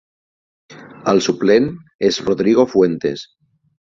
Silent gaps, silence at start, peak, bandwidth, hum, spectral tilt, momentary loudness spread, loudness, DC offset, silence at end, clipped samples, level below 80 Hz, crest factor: 1.95-1.99 s; 0.7 s; -2 dBFS; 7.6 kHz; none; -5.5 dB/octave; 10 LU; -16 LUFS; under 0.1%; 0.7 s; under 0.1%; -54 dBFS; 16 dB